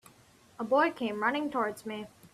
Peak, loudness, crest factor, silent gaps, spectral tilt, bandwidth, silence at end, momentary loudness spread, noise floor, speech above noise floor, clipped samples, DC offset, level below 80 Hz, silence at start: -14 dBFS; -31 LUFS; 18 dB; none; -5 dB/octave; 14 kHz; 0.05 s; 14 LU; -60 dBFS; 30 dB; under 0.1%; under 0.1%; -74 dBFS; 0.6 s